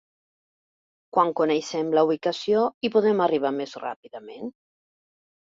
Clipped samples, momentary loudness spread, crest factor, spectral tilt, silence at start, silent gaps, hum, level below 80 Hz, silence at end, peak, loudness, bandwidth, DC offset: under 0.1%; 16 LU; 20 dB; -5.5 dB/octave; 1.15 s; 2.74-2.81 s, 3.96-4.03 s; none; -72 dBFS; 1 s; -6 dBFS; -23 LUFS; 7.6 kHz; under 0.1%